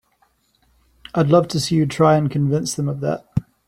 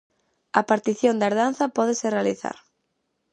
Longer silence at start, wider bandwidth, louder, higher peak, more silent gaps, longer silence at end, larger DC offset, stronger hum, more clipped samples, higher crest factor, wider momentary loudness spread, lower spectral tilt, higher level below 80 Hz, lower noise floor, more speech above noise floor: first, 1.15 s vs 0.55 s; first, 14.5 kHz vs 9.8 kHz; first, -19 LUFS vs -23 LUFS; about the same, -2 dBFS vs -2 dBFS; neither; second, 0.25 s vs 0.8 s; neither; neither; neither; about the same, 18 dB vs 22 dB; about the same, 9 LU vs 10 LU; first, -6.5 dB/octave vs -4.5 dB/octave; first, -50 dBFS vs -74 dBFS; second, -63 dBFS vs -75 dBFS; second, 45 dB vs 53 dB